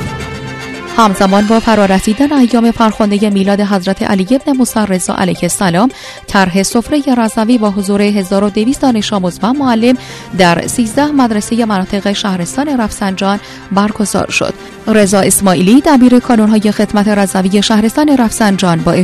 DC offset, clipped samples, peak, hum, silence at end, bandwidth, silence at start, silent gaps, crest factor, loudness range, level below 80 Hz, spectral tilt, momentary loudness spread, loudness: under 0.1%; 0.6%; 0 dBFS; none; 0 s; 14 kHz; 0 s; none; 10 dB; 4 LU; -36 dBFS; -5 dB/octave; 7 LU; -11 LUFS